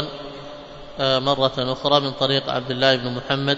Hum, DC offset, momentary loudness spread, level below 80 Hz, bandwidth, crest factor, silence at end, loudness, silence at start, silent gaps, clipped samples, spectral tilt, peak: none; under 0.1%; 18 LU; -48 dBFS; 7.8 kHz; 20 dB; 0 s; -20 LUFS; 0 s; none; under 0.1%; -5.5 dB/octave; -2 dBFS